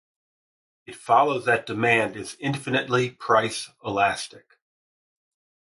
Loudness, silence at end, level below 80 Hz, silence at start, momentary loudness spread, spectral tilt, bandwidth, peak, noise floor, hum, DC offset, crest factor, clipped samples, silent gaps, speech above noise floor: -23 LUFS; 1.35 s; -64 dBFS; 0.9 s; 11 LU; -4.5 dB/octave; 11.5 kHz; -6 dBFS; under -90 dBFS; none; under 0.1%; 20 dB; under 0.1%; none; over 66 dB